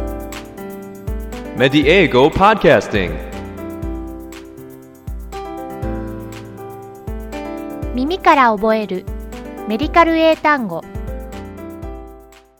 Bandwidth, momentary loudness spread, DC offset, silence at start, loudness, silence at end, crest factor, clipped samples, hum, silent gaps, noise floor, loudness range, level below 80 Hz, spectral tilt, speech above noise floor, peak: 19 kHz; 21 LU; under 0.1%; 0 s; -16 LUFS; 0.35 s; 18 dB; under 0.1%; none; none; -42 dBFS; 14 LU; -32 dBFS; -6 dB/octave; 28 dB; 0 dBFS